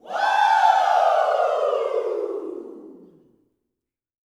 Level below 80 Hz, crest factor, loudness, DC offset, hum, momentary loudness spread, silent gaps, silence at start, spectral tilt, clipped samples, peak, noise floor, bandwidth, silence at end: -80 dBFS; 18 dB; -20 LUFS; under 0.1%; none; 16 LU; none; 0.05 s; -1.5 dB/octave; under 0.1%; -4 dBFS; -84 dBFS; 12.5 kHz; 1.45 s